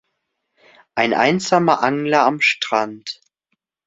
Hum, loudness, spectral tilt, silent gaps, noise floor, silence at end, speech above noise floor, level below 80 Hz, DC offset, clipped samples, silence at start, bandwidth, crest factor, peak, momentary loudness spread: none; -17 LUFS; -4.5 dB/octave; none; -74 dBFS; 0.75 s; 57 dB; -64 dBFS; under 0.1%; under 0.1%; 0.95 s; 8 kHz; 18 dB; 0 dBFS; 14 LU